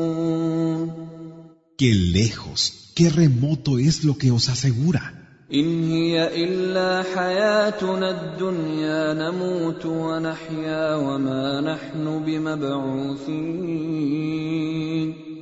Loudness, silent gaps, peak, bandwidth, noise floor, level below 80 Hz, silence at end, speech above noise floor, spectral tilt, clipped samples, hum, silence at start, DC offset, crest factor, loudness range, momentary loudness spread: -22 LUFS; none; -4 dBFS; 8 kHz; -45 dBFS; -50 dBFS; 0 s; 23 dB; -6 dB/octave; under 0.1%; none; 0 s; under 0.1%; 18 dB; 5 LU; 8 LU